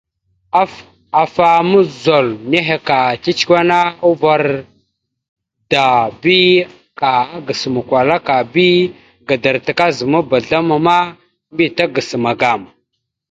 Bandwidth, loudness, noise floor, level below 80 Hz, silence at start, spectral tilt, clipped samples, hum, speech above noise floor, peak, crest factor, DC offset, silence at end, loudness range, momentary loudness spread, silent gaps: 7.8 kHz; -14 LUFS; -71 dBFS; -54 dBFS; 0.55 s; -5.5 dB/octave; under 0.1%; none; 58 dB; 0 dBFS; 14 dB; under 0.1%; 0.65 s; 2 LU; 8 LU; 5.29-5.36 s